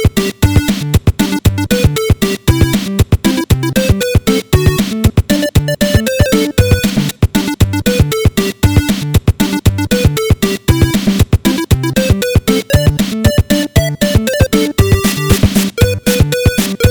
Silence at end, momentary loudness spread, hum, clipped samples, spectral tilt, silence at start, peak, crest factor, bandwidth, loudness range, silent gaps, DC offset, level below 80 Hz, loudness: 0 s; 2 LU; none; 0.8%; -5.5 dB/octave; 0 s; 0 dBFS; 12 dB; over 20 kHz; 1 LU; none; under 0.1%; -20 dBFS; -12 LUFS